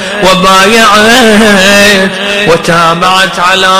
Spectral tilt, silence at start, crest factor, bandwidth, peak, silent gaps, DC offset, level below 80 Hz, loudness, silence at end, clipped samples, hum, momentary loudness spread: -3 dB/octave; 0 s; 4 dB; over 20 kHz; 0 dBFS; none; under 0.1%; -32 dBFS; -4 LUFS; 0 s; 6%; none; 4 LU